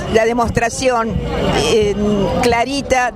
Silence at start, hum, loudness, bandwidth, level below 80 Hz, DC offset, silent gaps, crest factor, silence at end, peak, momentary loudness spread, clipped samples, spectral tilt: 0 s; none; -16 LUFS; 15.5 kHz; -30 dBFS; under 0.1%; none; 16 dB; 0 s; 0 dBFS; 3 LU; under 0.1%; -4.5 dB/octave